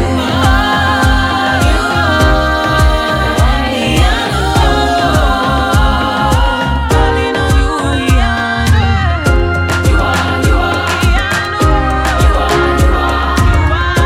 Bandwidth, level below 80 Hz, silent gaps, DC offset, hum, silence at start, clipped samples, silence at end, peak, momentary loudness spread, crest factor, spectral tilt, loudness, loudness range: 16 kHz; -16 dBFS; none; under 0.1%; none; 0 s; under 0.1%; 0 s; 0 dBFS; 2 LU; 10 dB; -5.5 dB/octave; -12 LUFS; 1 LU